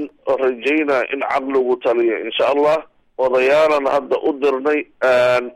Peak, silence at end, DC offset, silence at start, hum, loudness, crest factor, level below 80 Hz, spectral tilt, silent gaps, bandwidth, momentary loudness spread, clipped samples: -6 dBFS; 0.05 s; under 0.1%; 0 s; none; -17 LUFS; 10 dB; -58 dBFS; -5 dB/octave; none; 12 kHz; 6 LU; under 0.1%